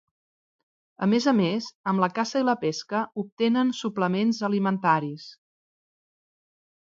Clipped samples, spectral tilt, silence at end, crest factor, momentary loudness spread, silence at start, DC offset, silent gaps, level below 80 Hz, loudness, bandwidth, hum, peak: under 0.1%; -6 dB/octave; 1.5 s; 20 dB; 7 LU; 1 s; under 0.1%; 1.75-1.84 s, 3.32-3.37 s; -74 dBFS; -25 LUFS; 7.6 kHz; none; -8 dBFS